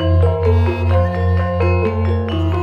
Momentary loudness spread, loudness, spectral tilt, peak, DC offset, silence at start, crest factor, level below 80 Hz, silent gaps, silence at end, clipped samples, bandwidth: 4 LU; -16 LUFS; -9 dB/octave; -4 dBFS; under 0.1%; 0 s; 10 dB; -26 dBFS; none; 0 s; under 0.1%; 5.2 kHz